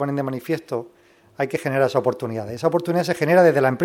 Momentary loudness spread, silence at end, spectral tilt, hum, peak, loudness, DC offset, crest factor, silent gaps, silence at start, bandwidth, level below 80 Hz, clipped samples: 13 LU; 0 s; -6.5 dB/octave; none; -4 dBFS; -21 LUFS; under 0.1%; 18 dB; none; 0 s; 16.5 kHz; -66 dBFS; under 0.1%